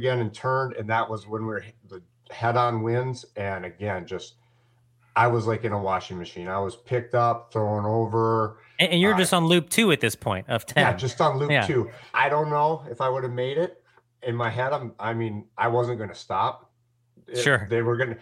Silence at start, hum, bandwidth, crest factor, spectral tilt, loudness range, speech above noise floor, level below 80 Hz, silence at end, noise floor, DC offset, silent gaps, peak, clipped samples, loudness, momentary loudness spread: 0 s; none; 16 kHz; 22 dB; -5 dB/octave; 6 LU; 43 dB; -64 dBFS; 0.05 s; -67 dBFS; under 0.1%; none; -4 dBFS; under 0.1%; -25 LUFS; 12 LU